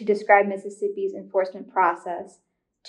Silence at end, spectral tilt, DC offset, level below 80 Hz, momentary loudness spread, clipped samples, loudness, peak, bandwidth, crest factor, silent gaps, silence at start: 0 s; -6 dB/octave; under 0.1%; -84 dBFS; 13 LU; under 0.1%; -23 LUFS; -4 dBFS; 10 kHz; 20 dB; none; 0 s